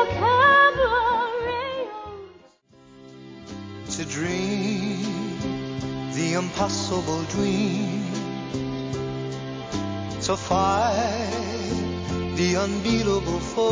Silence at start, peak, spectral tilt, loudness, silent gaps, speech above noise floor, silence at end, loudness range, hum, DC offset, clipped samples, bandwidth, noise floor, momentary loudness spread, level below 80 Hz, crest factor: 0 s; -6 dBFS; -4.5 dB/octave; -24 LUFS; none; 30 dB; 0 s; 6 LU; none; under 0.1%; under 0.1%; 8 kHz; -53 dBFS; 12 LU; -44 dBFS; 18 dB